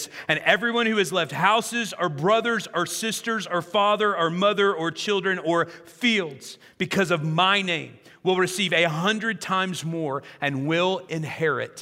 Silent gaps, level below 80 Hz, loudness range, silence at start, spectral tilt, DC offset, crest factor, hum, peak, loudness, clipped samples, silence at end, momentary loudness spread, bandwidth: none; -72 dBFS; 1 LU; 0 s; -4 dB/octave; under 0.1%; 22 dB; none; -2 dBFS; -23 LUFS; under 0.1%; 0 s; 8 LU; 16 kHz